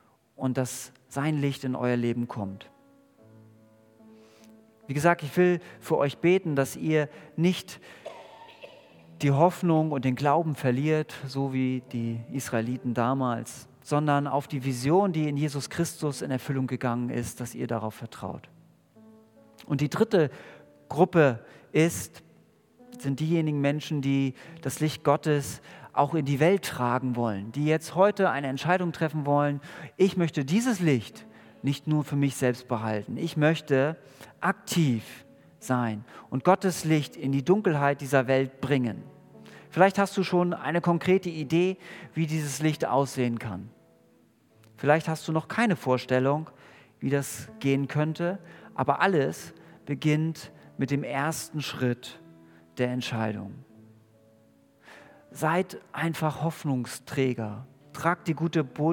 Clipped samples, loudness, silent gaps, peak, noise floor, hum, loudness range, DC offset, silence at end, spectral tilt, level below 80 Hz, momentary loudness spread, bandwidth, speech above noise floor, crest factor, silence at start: under 0.1%; -27 LUFS; none; -4 dBFS; -62 dBFS; none; 6 LU; under 0.1%; 0 s; -6 dB/octave; -70 dBFS; 13 LU; 18 kHz; 35 dB; 24 dB; 0.4 s